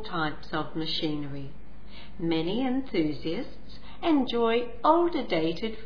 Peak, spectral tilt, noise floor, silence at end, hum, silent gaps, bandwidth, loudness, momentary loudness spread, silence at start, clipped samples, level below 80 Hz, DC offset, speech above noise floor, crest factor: -8 dBFS; -7.5 dB/octave; -47 dBFS; 0 s; none; none; 5.4 kHz; -28 LUFS; 18 LU; 0 s; under 0.1%; -50 dBFS; 2%; 20 dB; 20 dB